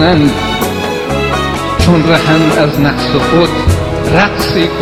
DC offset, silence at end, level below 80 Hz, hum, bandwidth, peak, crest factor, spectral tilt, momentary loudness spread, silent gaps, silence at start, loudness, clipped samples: under 0.1%; 0 s; -24 dBFS; none; 16.5 kHz; 0 dBFS; 10 dB; -5.5 dB/octave; 6 LU; none; 0 s; -11 LUFS; under 0.1%